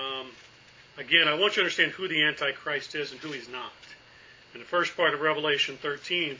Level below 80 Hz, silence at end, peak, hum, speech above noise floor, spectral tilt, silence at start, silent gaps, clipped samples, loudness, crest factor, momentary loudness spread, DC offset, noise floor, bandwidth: -72 dBFS; 0 s; -6 dBFS; none; 26 dB; -3 dB/octave; 0 s; none; under 0.1%; -26 LUFS; 24 dB; 17 LU; under 0.1%; -54 dBFS; 7.6 kHz